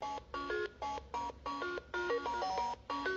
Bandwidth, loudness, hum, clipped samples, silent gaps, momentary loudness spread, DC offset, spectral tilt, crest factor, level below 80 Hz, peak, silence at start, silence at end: 8 kHz; -39 LUFS; none; under 0.1%; none; 6 LU; under 0.1%; -2 dB/octave; 14 dB; -60 dBFS; -24 dBFS; 0 s; 0 s